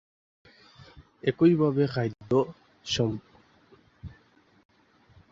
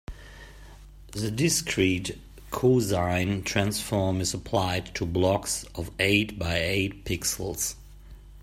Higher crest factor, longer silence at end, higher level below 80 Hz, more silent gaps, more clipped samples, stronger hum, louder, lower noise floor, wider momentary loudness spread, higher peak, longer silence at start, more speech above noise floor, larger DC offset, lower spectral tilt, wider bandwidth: about the same, 20 dB vs 20 dB; first, 1.25 s vs 0 s; second, -58 dBFS vs -46 dBFS; neither; neither; neither; about the same, -26 LUFS vs -26 LUFS; first, -62 dBFS vs -47 dBFS; first, 26 LU vs 14 LU; about the same, -10 dBFS vs -8 dBFS; first, 0.95 s vs 0.1 s; first, 37 dB vs 20 dB; neither; first, -6.5 dB/octave vs -4 dB/octave; second, 7.8 kHz vs 16 kHz